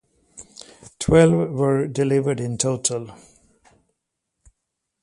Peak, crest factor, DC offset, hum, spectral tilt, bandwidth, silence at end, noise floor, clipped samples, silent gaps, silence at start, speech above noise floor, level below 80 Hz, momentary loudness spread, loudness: -2 dBFS; 20 dB; under 0.1%; none; -5.5 dB/octave; 11.5 kHz; 1.9 s; -79 dBFS; under 0.1%; none; 0.35 s; 60 dB; -48 dBFS; 25 LU; -20 LUFS